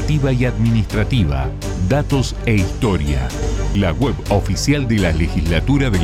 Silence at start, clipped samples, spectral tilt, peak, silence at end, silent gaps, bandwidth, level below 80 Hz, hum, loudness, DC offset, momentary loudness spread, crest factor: 0 s; under 0.1%; -6 dB/octave; -4 dBFS; 0 s; none; 15 kHz; -24 dBFS; none; -18 LUFS; under 0.1%; 4 LU; 12 dB